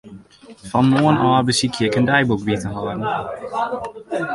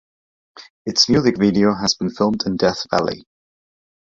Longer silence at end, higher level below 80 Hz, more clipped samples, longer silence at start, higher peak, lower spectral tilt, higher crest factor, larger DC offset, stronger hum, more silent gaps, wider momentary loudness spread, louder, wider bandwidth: second, 0 s vs 0.95 s; about the same, -50 dBFS vs -50 dBFS; neither; second, 0.05 s vs 0.55 s; about the same, -2 dBFS vs -2 dBFS; about the same, -5.5 dB/octave vs -4.5 dB/octave; about the same, 18 dB vs 18 dB; neither; neither; second, none vs 0.70-0.85 s; about the same, 11 LU vs 9 LU; about the same, -19 LUFS vs -18 LUFS; first, 11.5 kHz vs 7.8 kHz